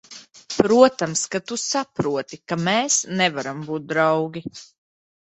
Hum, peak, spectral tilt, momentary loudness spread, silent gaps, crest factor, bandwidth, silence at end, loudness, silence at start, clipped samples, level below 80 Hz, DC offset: none; 0 dBFS; -3.5 dB/octave; 15 LU; none; 22 dB; 8.2 kHz; 0.65 s; -21 LUFS; 0.1 s; under 0.1%; -62 dBFS; under 0.1%